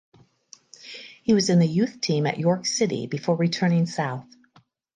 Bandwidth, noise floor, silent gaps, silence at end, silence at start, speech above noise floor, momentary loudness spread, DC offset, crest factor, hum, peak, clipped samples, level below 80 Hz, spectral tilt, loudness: 9.6 kHz; -60 dBFS; none; 0.75 s; 0.85 s; 38 dB; 18 LU; under 0.1%; 16 dB; none; -8 dBFS; under 0.1%; -66 dBFS; -5.5 dB/octave; -23 LUFS